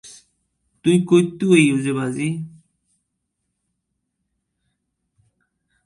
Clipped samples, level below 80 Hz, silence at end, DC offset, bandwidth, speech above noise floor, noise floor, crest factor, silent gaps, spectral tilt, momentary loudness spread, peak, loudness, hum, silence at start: under 0.1%; -64 dBFS; 3.4 s; under 0.1%; 11.5 kHz; 59 dB; -76 dBFS; 22 dB; none; -6 dB/octave; 11 LU; 0 dBFS; -18 LUFS; none; 0.05 s